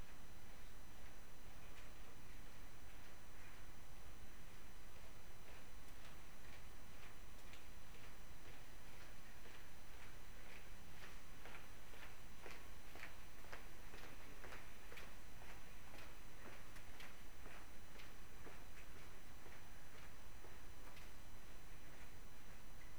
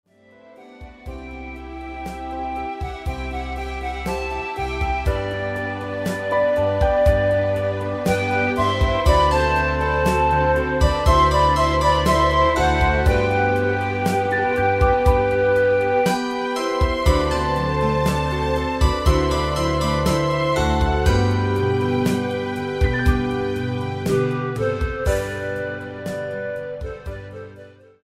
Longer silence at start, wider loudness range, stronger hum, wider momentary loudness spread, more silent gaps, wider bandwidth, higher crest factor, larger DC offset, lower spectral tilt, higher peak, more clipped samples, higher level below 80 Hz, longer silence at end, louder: second, 0 s vs 0.6 s; second, 3 LU vs 9 LU; neither; second, 4 LU vs 12 LU; neither; first, over 20 kHz vs 15.5 kHz; about the same, 20 dB vs 18 dB; first, 0.7% vs under 0.1%; second, -3.5 dB/octave vs -6 dB/octave; second, -34 dBFS vs -2 dBFS; neither; second, -62 dBFS vs -28 dBFS; second, 0 s vs 0.35 s; second, -60 LUFS vs -20 LUFS